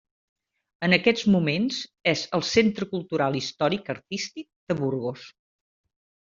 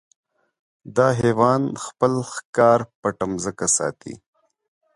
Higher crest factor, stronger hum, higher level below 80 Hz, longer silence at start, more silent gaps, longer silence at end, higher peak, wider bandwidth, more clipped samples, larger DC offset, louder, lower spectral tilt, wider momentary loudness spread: about the same, 24 dB vs 20 dB; neither; second, -62 dBFS vs -56 dBFS; about the same, 0.8 s vs 0.85 s; about the same, 4.56-4.67 s vs 2.45-2.53 s, 2.95-3.03 s; first, 0.95 s vs 0.8 s; about the same, -4 dBFS vs -4 dBFS; second, 7.6 kHz vs 11.5 kHz; neither; neither; second, -25 LUFS vs -21 LUFS; about the same, -4 dB/octave vs -5 dB/octave; about the same, 11 LU vs 10 LU